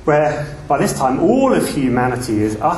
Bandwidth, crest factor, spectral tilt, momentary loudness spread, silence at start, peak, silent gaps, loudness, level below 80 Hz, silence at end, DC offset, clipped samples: 12.5 kHz; 16 dB; -6 dB/octave; 5 LU; 0 s; 0 dBFS; none; -16 LUFS; -40 dBFS; 0 s; under 0.1%; under 0.1%